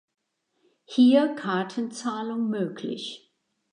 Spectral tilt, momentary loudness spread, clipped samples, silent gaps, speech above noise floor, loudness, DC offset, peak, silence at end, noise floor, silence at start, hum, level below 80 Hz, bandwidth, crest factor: -5.5 dB/octave; 15 LU; under 0.1%; none; 47 dB; -25 LUFS; under 0.1%; -8 dBFS; 0.55 s; -71 dBFS; 0.9 s; none; -82 dBFS; 10 kHz; 18 dB